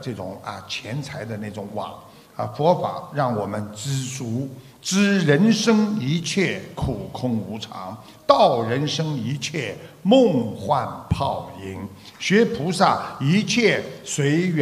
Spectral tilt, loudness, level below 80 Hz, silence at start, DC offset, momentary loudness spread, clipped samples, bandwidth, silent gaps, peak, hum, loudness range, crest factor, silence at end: -5.5 dB/octave; -22 LUFS; -50 dBFS; 0 s; under 0.1%; 15 LU; under 0.1%; 15 kHz; none; 0 dBFS; none; 5 LU; 22 dB; 0 s